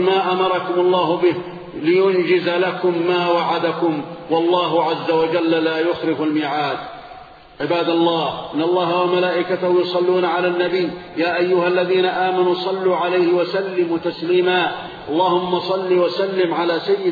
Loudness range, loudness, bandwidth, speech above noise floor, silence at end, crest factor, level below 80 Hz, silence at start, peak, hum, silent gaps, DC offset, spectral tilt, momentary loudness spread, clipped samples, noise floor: 2 LU; -18 LUFS; 4.9 kHz; 22 dB; 0 s; 14 dB; -60 dBFS; 0 s; -4 dBFS; none; none; under 0.1%; -7.5 dB/octave; 6 LU; under 0.1%; -40 dBFS